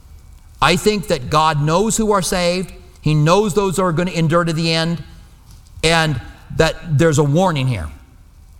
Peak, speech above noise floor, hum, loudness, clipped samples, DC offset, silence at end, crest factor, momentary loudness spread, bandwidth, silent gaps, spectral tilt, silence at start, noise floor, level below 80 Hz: 0 dBFS; 28 dB; none; -16 LUFS; under 0.1%; under 0.1%; 0.6 s; 16 dB; 10 LU; 16.5 kHz; none; -5 dB/octave; 0.15 s; -43 dBFS; -36 dBFS